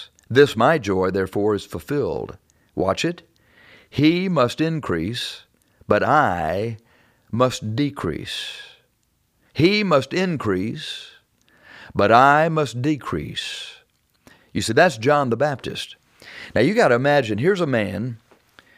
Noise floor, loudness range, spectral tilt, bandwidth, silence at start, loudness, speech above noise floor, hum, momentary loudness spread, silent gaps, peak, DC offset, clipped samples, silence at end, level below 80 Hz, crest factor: -67 dBFS; 4 LU; -5.5 dB/octave; 15.5 kHz; 0 s; -20 LUFS; 47 dB; none; 15 LU; none; -2 dBFS; under 0.1%; under 0.1%; 0.6 s; -52 dBFS; 20 dB